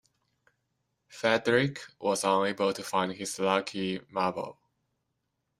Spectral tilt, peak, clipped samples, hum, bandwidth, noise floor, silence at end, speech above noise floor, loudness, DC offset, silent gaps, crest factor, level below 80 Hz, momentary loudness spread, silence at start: -4 dB/octave; -10 dBFS; under 0.1%; none; 15.5 kHz; -81 dBFS; 1.1 s; 52 dB; -29 LUFS; under 0.1%; none; 22 dB; -72 dBFS; 8 LU; 1.1 s